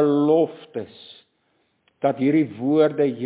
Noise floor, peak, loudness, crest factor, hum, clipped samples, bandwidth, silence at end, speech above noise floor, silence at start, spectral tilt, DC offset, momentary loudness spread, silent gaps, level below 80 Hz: -68 dBFS; -6 dBFS; -20 LUFS; 16 dB; none; under 0.1%; 4 kHz; 0 s; 47 dB; 0 s; -11.5 dB/octave; under 0.1%; 16 LU; none; -72 dBFS